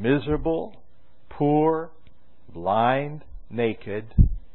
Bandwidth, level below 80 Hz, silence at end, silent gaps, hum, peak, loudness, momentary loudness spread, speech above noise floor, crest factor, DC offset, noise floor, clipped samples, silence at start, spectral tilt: 4.2 kHz; -32 dBFS; 0.15 s; none; none; -4 dBFS; -25 LUFS; 17 LU; 37 dB; 20 dB; 1%; -60 dBFS; under 0.1%; 0 s; -12 dB/octave